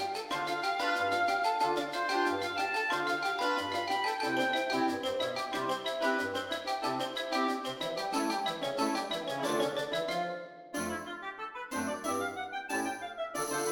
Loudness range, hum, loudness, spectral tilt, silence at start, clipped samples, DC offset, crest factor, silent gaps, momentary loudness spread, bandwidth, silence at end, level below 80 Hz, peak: 5 LU; none; -33 LUFS; -3 dB/octave; 0 s; under 0.1%; under 0.1%; 16 dB; none; 7 LU; 18 kHz; 0 s; -72 dBFS; -18 dBFS